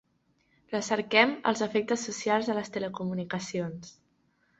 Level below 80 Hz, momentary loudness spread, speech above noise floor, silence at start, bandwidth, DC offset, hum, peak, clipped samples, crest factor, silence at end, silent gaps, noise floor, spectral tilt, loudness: -70 dBFS; 12 LU; 42 dB; 0.7 s; 8.2 kHz; under 0.1%; none; -8 dBFS; under 0.1%; 24 dB; 0.7 s; none; -71 dBFS; -4 dB/octave; -29 LUFS